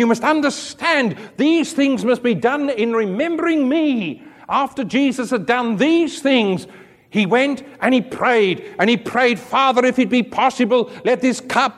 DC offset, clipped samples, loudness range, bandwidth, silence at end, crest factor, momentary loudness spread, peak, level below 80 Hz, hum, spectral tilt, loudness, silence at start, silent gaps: under 0.1%; under 0.1%; 2 LU; 13 kHz; 0.05 s; 16 dB; 6 LU; -2 dBFS; -62 dBFS; none; -5 dB/octave; -18 LUFS; 0 s; none